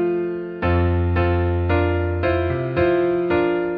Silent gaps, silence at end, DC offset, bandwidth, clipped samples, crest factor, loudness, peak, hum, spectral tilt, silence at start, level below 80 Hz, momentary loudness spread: none; 0 s; under 0.1%; 4.9 kHz; under 0.1%; 12 dB; -20 LUFS; -6 dBFS; none; -10.5 dB/octave; 0 s; -34 dBFS; 3 LU